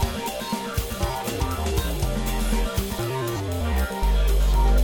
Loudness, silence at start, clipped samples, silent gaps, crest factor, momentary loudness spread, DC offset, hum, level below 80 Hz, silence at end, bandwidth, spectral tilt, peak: -26 LUFS; 0 s; under 0.1%; none; 12 dB; 5 LU; under 0.1%; none; -24 dBFS; 0 s; over 20 kHz; -5 dB/octave; -10 dBFS